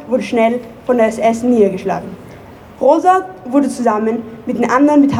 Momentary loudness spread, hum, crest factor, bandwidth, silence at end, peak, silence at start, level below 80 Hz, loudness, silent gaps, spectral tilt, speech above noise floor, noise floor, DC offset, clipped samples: 12 LU; none; 14 dB; 12.5 kHz; 0 s; 0 dBFS; 0 s; -50 dBFS; -14 LUFS; none; -6.5 dB/octave; 23 dB; -36 dBFS; under 0.1%; under 0.1%